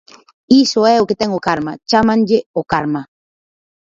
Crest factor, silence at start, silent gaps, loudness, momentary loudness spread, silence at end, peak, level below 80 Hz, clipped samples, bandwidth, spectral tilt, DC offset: 16 dB; 0.5 s; 2.46-2.54 s; -15 LUFS; 8 LU; 0.95 s; 0 dBFS; -50 dBFS; under 0.1%; 7.8 kHz; -5 dB/octave; under 0.1%